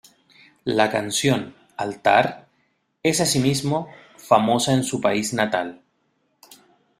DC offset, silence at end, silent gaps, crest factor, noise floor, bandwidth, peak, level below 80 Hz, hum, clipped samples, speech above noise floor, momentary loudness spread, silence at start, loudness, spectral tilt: under 0.1%; 1.25 s; none; 22 dB; -68 dBFS; 16 kHz; -2 dBFS; -60 dBFS; none; under 0.1%; 48 dB; 12 LU; 0.65 s; -21 LUFS; -4 dB/octave